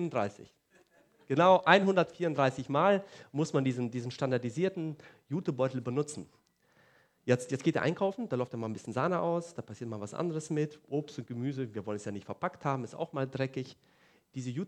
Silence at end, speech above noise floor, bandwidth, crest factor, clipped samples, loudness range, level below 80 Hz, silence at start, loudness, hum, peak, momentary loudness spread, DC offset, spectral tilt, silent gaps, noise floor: 0 s; 36 dB; 11.5 kHz; 26 dB; under 0.1%; 9 LU; -76 dBFS; 0 s; -32 LUFS; none; -6 dBFS; 14 LU; under 0.1%; -6 dB/octave; none; -68 dBFS